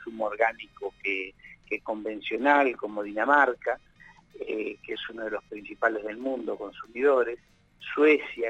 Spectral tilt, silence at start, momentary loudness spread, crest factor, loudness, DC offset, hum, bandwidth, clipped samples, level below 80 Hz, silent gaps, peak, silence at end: -5 dB/octave; 0 s; 16 LU; 20 dB; -27 LUFS; under 0.1%; none; 8 kHz; under 0.1%; -64 dBFS; none; -8 dBFS; 0 s